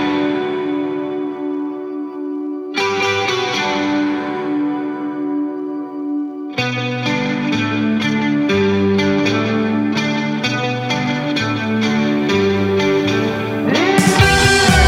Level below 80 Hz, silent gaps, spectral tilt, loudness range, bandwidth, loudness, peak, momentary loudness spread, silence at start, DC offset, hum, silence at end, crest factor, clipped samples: -34 dBFS; none; -5 dB/octave; 5 LU; 16 kHz; -17 LUFS; 0 dBFS; 10 LU; 0 s; under 0.1%; none; 0 s; 16 dB; under 0.1%